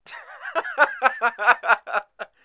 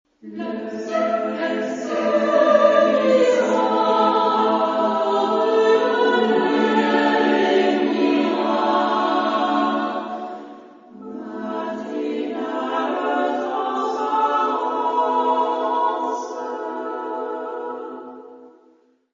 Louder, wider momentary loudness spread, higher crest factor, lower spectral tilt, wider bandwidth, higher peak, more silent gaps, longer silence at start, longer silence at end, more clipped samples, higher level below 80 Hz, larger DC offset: about the same, -21 LUFS vs -20 LUFS; first, 17 LU vs 13 LU; about the same, 22 dB vs 18 dB; about the same, -4.5 dB/octave vs -5 dB/octave; second, 4 kHz vs 7.6 kHz; about the same, -2 dBFS vs -2 dBFS; neither; second, 0.1 s vs 0.25 s; second, 0.2 s vs 0.65 s; neither; second, -76 dBFS vs -70 dBFS; neither